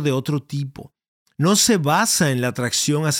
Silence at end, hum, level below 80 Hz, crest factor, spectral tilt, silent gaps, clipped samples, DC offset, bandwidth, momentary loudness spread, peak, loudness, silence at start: 0 s; none; -58 dBFS; 16 dB; -4 dB/octave; 1.08-1.26 s; under 0.1%; under 0.1%; 17 kHz; 12 LU; -4 dBFS; -19 LUFS; 0 s